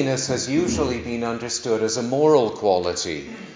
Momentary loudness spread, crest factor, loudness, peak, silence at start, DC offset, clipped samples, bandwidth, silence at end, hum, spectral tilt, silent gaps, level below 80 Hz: 9 LU; 18 dB; -22 LUFS; -4 dBFS; 0 s; under 0.1%; under 0.1%; 7.8 kHz; 0 s; none; -4.5 dB/octave; none; -46 dBFS